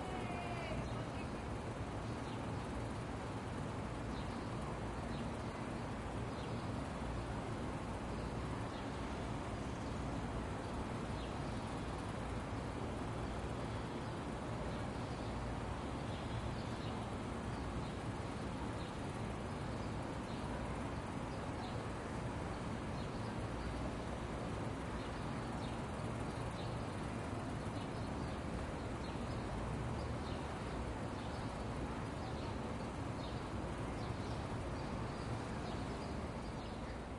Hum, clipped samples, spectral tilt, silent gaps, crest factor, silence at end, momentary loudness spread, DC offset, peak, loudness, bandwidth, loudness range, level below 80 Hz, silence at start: none; under 0.1%; -6.5 dB/octave; none; 14 dB; 0 s; 1 LU; under 0.1%; -28 dBFS; -44 LUFS; 11.5 kHz; 0 LU; -52 dBFS; 0 s